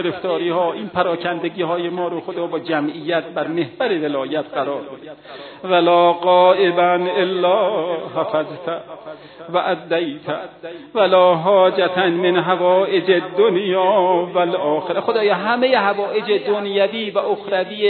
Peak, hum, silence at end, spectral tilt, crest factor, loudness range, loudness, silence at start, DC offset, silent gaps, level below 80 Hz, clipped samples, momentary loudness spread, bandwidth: -2 dBFS; none; 0 s; -8.5 dB/octave; 16 dB; 6 LU; -18 LUFS; 0 s; under 0.1%; none; -68 dBFS; under 0.1%; 13 LU; 4.5 kHz